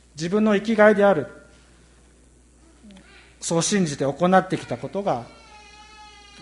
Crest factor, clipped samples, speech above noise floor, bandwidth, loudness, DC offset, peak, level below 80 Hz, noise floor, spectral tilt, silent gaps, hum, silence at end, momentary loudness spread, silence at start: 20 dB; under 0.1%; 33 dB; 11.5 kHz; -21 LUFS; under 0.1%; -4 dBFS; -56 dBFS; -54 dBFS; -5 dB/octave; none; none; 0.35 s; 14 LU; 0.15 s